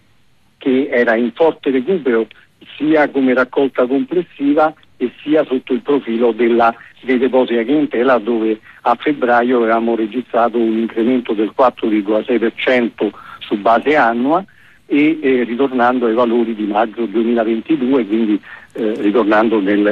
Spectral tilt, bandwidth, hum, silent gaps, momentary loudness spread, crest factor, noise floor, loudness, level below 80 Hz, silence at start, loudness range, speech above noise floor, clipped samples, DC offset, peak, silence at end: -7.5 dB/octave; 6 kHz; none; none; 6 LU; 12 dB; -56 dBFS; -15 LUFS; -60 dBFS; 0.6 s; 1 LU; 42 dB; under 0.1%; under 0.1%; -2 dBFS; 0 s